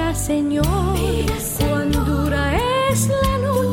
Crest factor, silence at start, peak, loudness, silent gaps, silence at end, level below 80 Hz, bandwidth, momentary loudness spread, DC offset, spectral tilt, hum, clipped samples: 12 dB; 0 s; -6 dBFS; -19 LUFS; none; 0 s; -26 dBFS; 16.5 kHz; 3 LU; under 0.1%; -5.5 dB/octave; none; under 0.1%